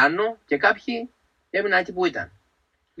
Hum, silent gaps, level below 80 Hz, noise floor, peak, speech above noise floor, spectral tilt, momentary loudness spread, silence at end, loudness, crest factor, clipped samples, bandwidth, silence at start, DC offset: none; none; -64 dBFS; -70 dBFS; -4 dBFS; 47 dB; -5 dB/octave; 13 LU; 0.75 s; -23 LUFS; 22 dB; under 0.1%; 8.2 kHz; 0 s; under 0.1%